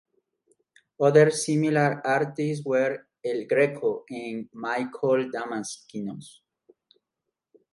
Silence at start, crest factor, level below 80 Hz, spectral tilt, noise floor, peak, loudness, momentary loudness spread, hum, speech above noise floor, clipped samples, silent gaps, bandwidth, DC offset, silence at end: 1 s; 22 dB; -76 dBFS; -5.5 dB/octave; -85 dBFS; -6 dBFS; -25 LUFS; 15 LU; none; 60 dB; under 0.1%; none; 11.5 kHz; under 0.1%; 1.45 s